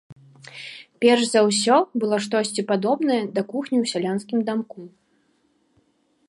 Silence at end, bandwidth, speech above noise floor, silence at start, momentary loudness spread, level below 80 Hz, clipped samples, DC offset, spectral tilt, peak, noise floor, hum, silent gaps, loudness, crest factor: 1.4 s; 11.5 kHz; 44 dB; 0.1 s; 19 LU; -74 dBFS; under 0.1%; under 0.1%; -4 dB/octave; -4 dBFS; -65 dBFS; none; 0.12-0.16 s; -21 LUFS; 18 dB